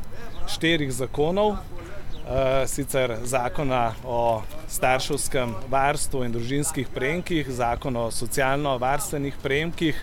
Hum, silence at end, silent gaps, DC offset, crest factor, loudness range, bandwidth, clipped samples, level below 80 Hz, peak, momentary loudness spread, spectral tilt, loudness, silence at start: none; 0 s; none; under 0.1%; 18 dB; 1 LU; 16.5 kHz; under 0.1%; -36 dBFS; -6 dBFS; 7 LU; -4.5 dB/octave; -25 LUFS; 0 s